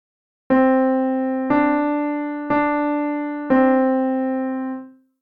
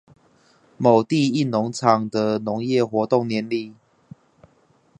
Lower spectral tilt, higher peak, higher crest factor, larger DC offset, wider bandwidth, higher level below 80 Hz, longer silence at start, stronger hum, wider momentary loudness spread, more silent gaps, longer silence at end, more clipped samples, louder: first, -9 dB/octave vs -6.5 dB/octave; second, -4 dBFS vs 0 dBFS; second, 16 dB vs 22 dB; neither; second, 4.2 kHz vs 9.4 kHz; first, -58 dBFS vs -64 dBFS; second, 0.5 s vs 0.8 s; neither; about the same, 9 LU vs 7 LU; neither; second, 0.3 s vs 1.25 s; neither; about the same, -20 LUFS vs -21 LUFS